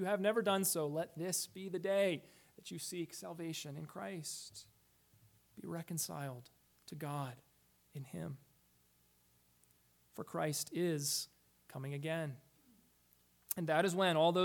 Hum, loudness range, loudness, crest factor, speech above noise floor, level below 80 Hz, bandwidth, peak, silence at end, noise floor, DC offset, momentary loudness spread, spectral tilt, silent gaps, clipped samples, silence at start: none; 11 LU; -39 LUFS; 22 dB; 34 dB; -82 dBFS; 19 kHz; -18 dBFS; 0 s; -73 dBFS; under 0.1%; 19 LU; -4 dB/octave; none; under 0.1%; 0 s